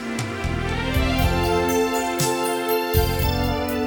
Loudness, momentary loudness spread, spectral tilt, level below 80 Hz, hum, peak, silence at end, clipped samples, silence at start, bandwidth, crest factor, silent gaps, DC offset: -22 LUFS; 5 LU; -5 dB/octave; -30 dBFS; none; -6 dBFS; 0 s; under 0.1%; 0 s; over 20 kHz; 16 dB; none; under 0.1%